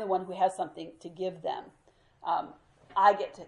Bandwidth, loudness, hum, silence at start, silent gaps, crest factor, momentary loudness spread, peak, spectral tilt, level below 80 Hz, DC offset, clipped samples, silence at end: 11.5 kHz; -30 LUFS; none; 0 s; none; 22 dB; 18 LU; -10 dBFS; -5 dB/octave; -72 dBFS; under 0.1%; under 0.1%; 0 s